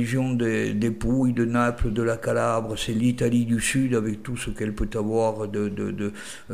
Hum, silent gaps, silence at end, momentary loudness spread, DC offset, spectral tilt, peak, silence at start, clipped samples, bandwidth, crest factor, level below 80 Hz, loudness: none; none; 0 s; 7 LU; 0.6%; -6 dB/octave; -10 dBFS; 0 s; under 0.1%; 15.5 kHz; 14 dB; -38 dBFS; -25 LUFS